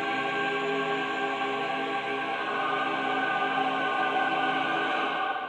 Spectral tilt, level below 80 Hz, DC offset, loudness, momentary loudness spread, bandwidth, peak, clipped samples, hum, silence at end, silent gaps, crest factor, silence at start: -4 dB/octave; -70 dBFS; under 0.1%; -28 LUFS; 3 LU; 10 kHz; -16 dBFS; under 0.1%; none; 0 s; none; 14 dB; 0 s